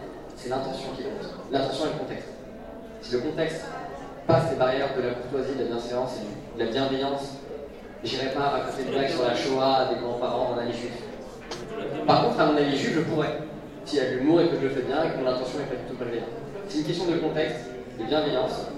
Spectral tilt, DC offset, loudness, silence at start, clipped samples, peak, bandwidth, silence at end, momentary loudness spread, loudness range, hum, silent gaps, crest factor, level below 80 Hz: -6 dB/octave; under 0.1%; -27 LUFS; 0 s; under 0.1%; -6 dBFS; 12.5 kHz; 0 s; 16 LU; 5 LU; none; none; 20 dB; -52 dBFS